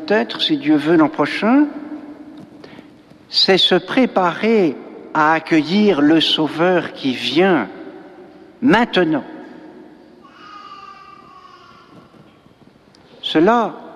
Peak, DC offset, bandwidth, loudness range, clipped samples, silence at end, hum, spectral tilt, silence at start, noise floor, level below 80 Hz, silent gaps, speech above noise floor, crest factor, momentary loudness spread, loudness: -2 dBFS; under 0.1%; 11.5 kHz; 7 LU; under 0.1%; 0 s; none; -5.5 dB/octave; 0 s; -48 dBFS; -58 dBFS; none; 33 dB; 16 dB; 23 LU; -16 LUFS